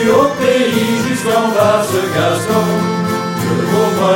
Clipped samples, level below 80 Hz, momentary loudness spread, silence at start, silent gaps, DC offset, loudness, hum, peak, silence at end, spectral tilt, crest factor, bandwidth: under 0.1%; -50 dBFS; 4 LU; 0 s; none; under 0.1%; -14 LUFS; none; 0 dBFS; 0 s; -5 dB/octave; 12 dB; 17 kHz